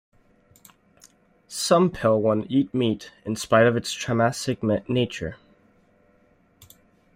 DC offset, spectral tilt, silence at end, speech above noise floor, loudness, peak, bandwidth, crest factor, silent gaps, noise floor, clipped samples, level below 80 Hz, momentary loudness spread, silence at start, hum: under 0.1%; -5.5 dB/octave; 1.8 s; 38 dB; -23 LUFS; -6 dBFS; 16 kHz; 20 dB; none; -61 dBFS; under 0.1%; -56 dBFS; 13 LU; 1.5 s; none